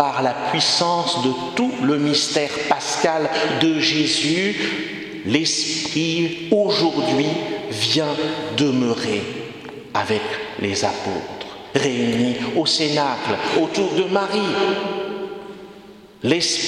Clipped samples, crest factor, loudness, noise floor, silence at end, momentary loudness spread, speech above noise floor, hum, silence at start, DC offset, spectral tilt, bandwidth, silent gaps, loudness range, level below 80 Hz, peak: under 0.1%; 20 dB; -20 LUFS; -43 dBFS; 0 s; 9 LU; 23 dB; none; 0 s; under 0.1%; -3.5 dB/octave; 13 kHz; none; 4 LU; -60 dBFS; 0 dBFS